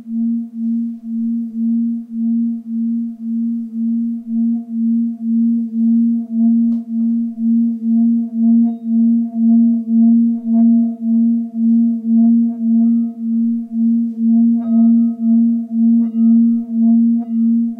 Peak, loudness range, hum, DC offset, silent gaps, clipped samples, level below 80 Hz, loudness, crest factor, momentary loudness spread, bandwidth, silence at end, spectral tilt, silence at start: -6 dBFS; 6 LU; none; under 0.1%; none; under 0.1%; -70 dBFS; -15 LUFS; 8 dB; 8 LU; 1.2 kHz; 0.05 s; -12.5 dB/octave; 0 s